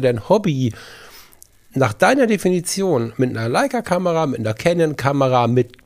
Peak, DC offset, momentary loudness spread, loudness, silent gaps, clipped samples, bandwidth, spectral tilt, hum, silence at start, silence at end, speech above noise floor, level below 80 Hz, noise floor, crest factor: 0 dBFS; under 0.1%; 6 LU; -18 LUFS; none; under 0.1%; 15.5 kHz; -6 dB/octave; none; 0 s; 0.2 s; 30 dB; -52 dBFS; -48 dBFS; 18 dB